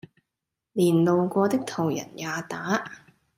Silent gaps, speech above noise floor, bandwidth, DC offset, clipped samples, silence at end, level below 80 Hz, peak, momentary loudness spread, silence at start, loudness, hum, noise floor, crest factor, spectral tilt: none; 61 dB; 16 kHz; under 0.1%; under 0.1%; 0.4 s; -70 dBFS; -10 dBFS; 11 LU; 0.75 s; -25 LUFS; none; -85 dBFS; 16 dB; -6 dB/octave